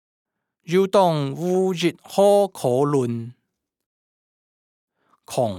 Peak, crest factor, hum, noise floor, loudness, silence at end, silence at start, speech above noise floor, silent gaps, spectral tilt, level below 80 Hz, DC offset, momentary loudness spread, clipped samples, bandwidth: -4 dBFS; 18 dB; none; -77 dBFS; -20 LUFS; 0 s; 0.7 s; 57 dB; 3.86-4.88 s; -6 dB/octave; -74 dBFS; under 0.1%; 10 LU; under 0.1%; 16 kHz